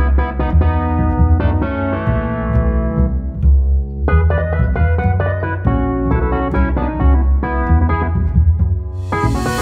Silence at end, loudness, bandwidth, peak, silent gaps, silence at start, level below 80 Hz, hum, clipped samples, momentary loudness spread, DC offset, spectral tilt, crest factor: 0 s; -16 LUFS; 9 kHz; -2 dBFS; none; 0 s; -18 dBFS; none; under 0.1%; 4 LU; under 0.1%; -8.5 dB/octave; 14 dB